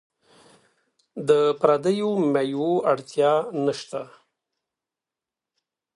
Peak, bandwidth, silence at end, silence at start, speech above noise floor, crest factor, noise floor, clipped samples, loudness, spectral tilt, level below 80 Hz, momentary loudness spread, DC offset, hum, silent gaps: -4 dBFS; 11 kHz; 1.9 s; 1.15 s; 67 dB; 22 dB; -89 dBFS; under 0.1%; -22 LUFS; -6 dB/octave; -74 dBFS; 14 LU; under 0.1%; none; none